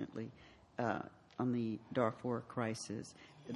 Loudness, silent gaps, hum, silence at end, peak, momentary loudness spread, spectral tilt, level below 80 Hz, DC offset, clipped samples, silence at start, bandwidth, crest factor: -41 LUFS; none; none; 0 s; -18 dBFS; 14 LU; -6 dB/octave; -72 dBFS; under 0.1%; under 0.1%; 0 s; 11.5 kHz; 22 dB